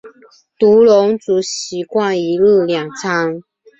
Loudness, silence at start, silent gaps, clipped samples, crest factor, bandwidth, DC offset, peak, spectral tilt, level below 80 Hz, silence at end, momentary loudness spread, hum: -14 LUFS; 0.05 s; none; under 0.1%; 12 dB; 8.2 kHz; under 0.1%; -2 dBFS; -4.5 dB/octave; -58 dBFS; 0.4 s; 12 LU; none